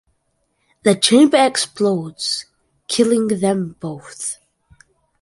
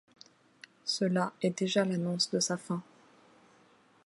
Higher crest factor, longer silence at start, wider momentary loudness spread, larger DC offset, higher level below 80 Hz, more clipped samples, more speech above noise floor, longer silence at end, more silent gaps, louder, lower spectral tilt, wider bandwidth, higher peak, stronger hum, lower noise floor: about the same, 18 dB vs 20 dB; about the same, 0.85 s vs 0.85 s; first, 15 LU vs 9 LU; neither; first, -62 dBFS vs -82 dBFS; neither; first, 51 dB vs 33 dB; second, 0.9 s vs 1.25 s; neither; first, -17 LUFS vs -31 LUFS; about the same, -4 dB/octave vs -4.5 dB/octave; about the same, 11.5 kHz vs 11.5 kHz; first, 0 dBFS vs -14 dBFS; neither; first, -68 dBFS vs -64 dBFS